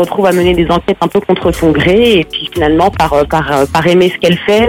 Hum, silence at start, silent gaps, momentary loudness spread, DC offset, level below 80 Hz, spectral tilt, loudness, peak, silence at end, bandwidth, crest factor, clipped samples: none; 0 s; none; 4 LU; 0.2%; -30 dBFS; -6 dB/octave; -10 LUFS; 0 dBFS; 0 s; 16.5 kHz; 10 dB; under 0.1%